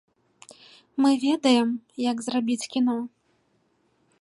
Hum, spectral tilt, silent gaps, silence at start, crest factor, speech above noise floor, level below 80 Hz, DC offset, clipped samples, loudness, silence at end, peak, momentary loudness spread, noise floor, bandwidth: none; -3.5 dB/octave; none; 0.95 s; 18 dB; 45 dB; -78 dBFS; under 0.1%; under 0.1%; -24 LUFS; 1.15 s; -8 dBFS; 10 LU; -68 dBFS; 11.5 kHz